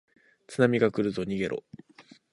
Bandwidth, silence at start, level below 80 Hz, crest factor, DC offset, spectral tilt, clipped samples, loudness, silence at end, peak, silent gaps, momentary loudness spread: 11 kHz; 0.5 s; -62 dBFS; 20 dB; under 0.1%; -7 dB/octave; under 0.1%; -27 LUFS; 0.3 s; -8 dBFS; none; 13 LU